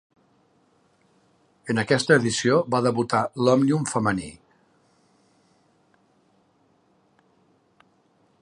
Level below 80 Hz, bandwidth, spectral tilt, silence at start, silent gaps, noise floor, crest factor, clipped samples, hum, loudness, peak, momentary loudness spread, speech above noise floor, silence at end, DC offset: -62 dBFS; 11 kHz; -5 dB/octave; 1.65 s; none; -64 dBFS; 22 dB; under 0.1%; none; -22 LUFS; -4 dBFS; 9 LU; 42 dB; 4.1 s; under 0.1%